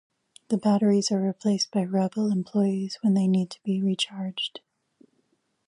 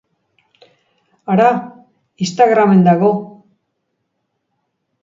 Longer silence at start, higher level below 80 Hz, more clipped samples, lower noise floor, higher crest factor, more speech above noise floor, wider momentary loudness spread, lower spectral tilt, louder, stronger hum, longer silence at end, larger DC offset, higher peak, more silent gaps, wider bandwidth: second, 0.5 s vs 1.3 s; second, -74 dBFS vs -64 dBFS; neither; about the same, -71 dBFS vs -71 dBFS; about the same, 14 dB vs 16 dB; second, 47 dB vs 59 dB; second, 8 LU vs 13 LU; second, -5.5 dB/octave vs -7 dB/octave; second, -25 LUFS vs -13 LUFS; neither; second, 1.1 s vs 1.75 s; neither; second, -12 dBFS vs 0 dBFS; neither; first, 11 kHz vs 7.6 kHz